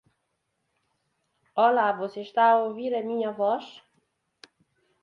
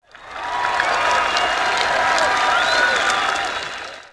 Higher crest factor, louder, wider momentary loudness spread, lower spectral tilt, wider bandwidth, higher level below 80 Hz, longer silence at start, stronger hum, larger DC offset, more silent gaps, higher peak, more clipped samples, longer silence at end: about the same, 20 dB vs 18 dB; second, -25 LUFS vs -18 LUFS; about the same, 11 LU vs 11 LU; first, -6 dB/octave vs -0.5 dB/octave; second, 7 kHz vs 11 kHz; second, -80 dBFS vs -50 dBFS; first, 1.55 s vs 0.15 s; neither; neither; neither; second, -8 dBFS vs -2 dBFS; neither; first, 1.25 s vs 0.05 s